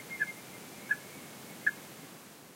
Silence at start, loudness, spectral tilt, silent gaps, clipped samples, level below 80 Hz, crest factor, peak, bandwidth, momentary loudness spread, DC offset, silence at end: 0 s; -37 LUFS; -2.5 dB/octave; none; under 0.1%; -80 dBFS; 24 dB; -16 dBFS; 16 kHz; 15 LU; under 0.1%; 0 s